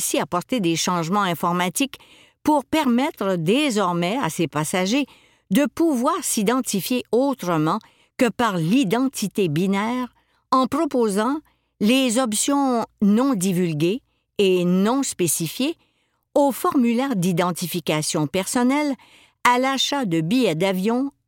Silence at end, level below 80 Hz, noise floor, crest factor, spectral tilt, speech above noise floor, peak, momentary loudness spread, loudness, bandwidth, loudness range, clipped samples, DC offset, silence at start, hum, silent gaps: 0.15 s; -62 dBFS; -68 dBFS; 18 dB; -4.5 dB/octave; 48 dB; -2 dBFS; 6 LU; -21 LUFS; 17 kHz; 2 LU; under 0.1%; under 0.1%; 0 s; none; none